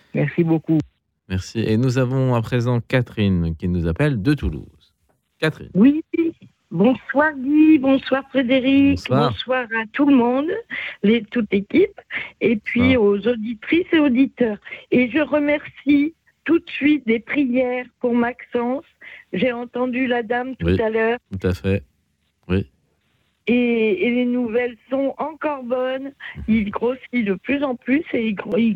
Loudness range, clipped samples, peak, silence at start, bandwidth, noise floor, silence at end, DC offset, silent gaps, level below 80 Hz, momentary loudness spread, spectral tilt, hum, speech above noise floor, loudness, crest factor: 5 LU; under 0.1%; -4 dBFS; 0.15 s; 10 kHz; -67 dBFS; 0 s; under 0.1%; none; -44 dBFS; 9 LU; -8 dB/octave; none; 48 dB; -20 LUFS; 16 dB